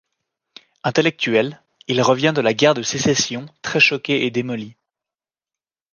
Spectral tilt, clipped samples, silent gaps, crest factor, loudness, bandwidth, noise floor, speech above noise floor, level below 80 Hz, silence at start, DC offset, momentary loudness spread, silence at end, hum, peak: -4 dB/octave; under 0.1%; none; 18 dB; -18 LUFS; 10.5 kHz; under -90 dBFS; over 72 dB; -60 dBFS; 0.85 s; under 0.1%; 13 LU; 1.2 s; none; -2 dBFS